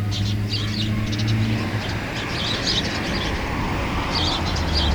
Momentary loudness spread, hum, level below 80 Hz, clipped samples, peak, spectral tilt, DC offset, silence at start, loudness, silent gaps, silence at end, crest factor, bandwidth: 4 LU; none; -32 dBFS; under 0.1%; -10 dBFS; -5 dB/octave; under 0.1%; 0 s; -23 LUFS; none; 0 s; 14 dB; over 20 kHz